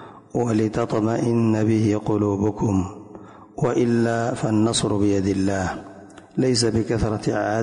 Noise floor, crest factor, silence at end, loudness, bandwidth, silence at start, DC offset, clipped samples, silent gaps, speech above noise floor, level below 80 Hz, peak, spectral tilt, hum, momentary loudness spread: -42 dBFS; 14 dB; 0 s; -22 LUFS; 11 kHz; 0 s; under 0.1%; under 0.1%; none; 22 dB; -44 dBFS; -8 dBFS; -6 dB/octave; none; 10 LU